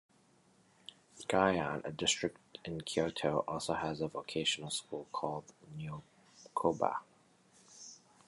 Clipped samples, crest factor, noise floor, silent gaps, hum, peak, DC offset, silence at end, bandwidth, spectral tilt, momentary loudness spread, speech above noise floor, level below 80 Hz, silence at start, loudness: under 0.1%; 24 dB; -68 dBFS; none; none; -14 dBFS; under 0.1%; 0.3 s; 11.5 kHz; -3.5 dB/octave; 20 LU; 33 dB; -66 dBFS; 1.15 s; -36 LUFS